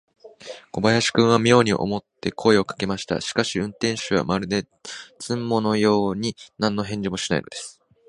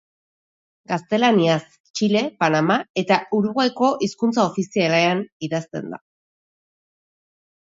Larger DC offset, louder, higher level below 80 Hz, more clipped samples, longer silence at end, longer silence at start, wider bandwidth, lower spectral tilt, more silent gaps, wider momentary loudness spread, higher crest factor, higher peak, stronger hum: neither; about the same, -22 LUFS vs -20 LUFS; first, -52 dBFS vs -68 dBFS; neither; second, 0.35 s vs 1.65 s; second, 0.25 s vs 0.9 s; first, 11.5 kHz vs 7.8 kHz; about the same, -5 dB/octave vs -5.5 dB/octave; second, none vs 1.80-1.84 s, 1.90-1.94 s, 2.90-2.94 s, 5.32-5.40 s; first, 17 LU vs 10 LU; about the same, 22 dB vs 18 dB; about the same, 0 dBFS vs -2 dBFS; neither